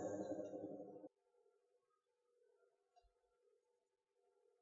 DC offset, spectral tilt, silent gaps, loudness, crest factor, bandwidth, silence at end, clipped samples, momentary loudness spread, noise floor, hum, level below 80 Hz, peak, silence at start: under 0.1%; -7.5 dB/octave; none; -51 LUFS; 22 dB; 7.4 kHz; 1.55 s; under 0.1%; 14 LU; -88 dBFS; none; under -90 dBFS; -34 dBFS; 0 s